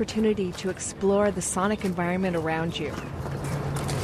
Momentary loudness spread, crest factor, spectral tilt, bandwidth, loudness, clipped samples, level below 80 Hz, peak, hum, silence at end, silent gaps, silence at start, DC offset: 8 LU; 16 dB; -5 dB/octave; 13.5 kHz; -27 LUFS; under 0.1%; -46 dBFS; -10 dBFS; none; 0 s; none; 0 s; under 0.1%